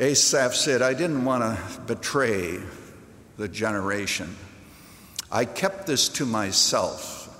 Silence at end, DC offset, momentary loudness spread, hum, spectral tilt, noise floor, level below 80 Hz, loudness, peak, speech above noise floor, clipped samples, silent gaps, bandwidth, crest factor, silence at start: 0 s; under 0.1%; 16 LU; none; -2.5 dB/octave; -48 dBFS; -58 dBFS; -24 LUFS; -6 dBFS; 23 dB; under 0.1%; none; 16 kHz; 20 dB; 0 s